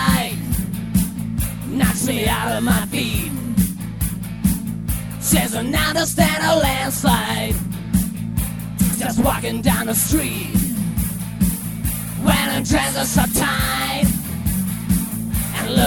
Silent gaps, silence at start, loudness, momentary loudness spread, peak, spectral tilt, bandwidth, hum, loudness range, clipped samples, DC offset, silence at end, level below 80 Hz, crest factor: none; 0 s; -20 LUFS; 7 LU; -2 dBFS; -4.5 dB/octave; over 20 kHz; none; 2 LU; under 0.1%; 0.2%; 0 s; -30 dBFS; 18 dB